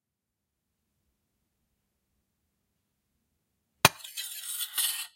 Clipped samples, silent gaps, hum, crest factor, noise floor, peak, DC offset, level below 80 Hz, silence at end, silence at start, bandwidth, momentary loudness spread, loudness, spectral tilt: under 0.1%; none; none; 36 dB; -86 dBFS; 0 dBFS; under 0.1%; -68 dBFS; 0.1 s; 3.85 s; 16.5 kHz; 12 LU; -27 LUFS; -1.5 dB/octave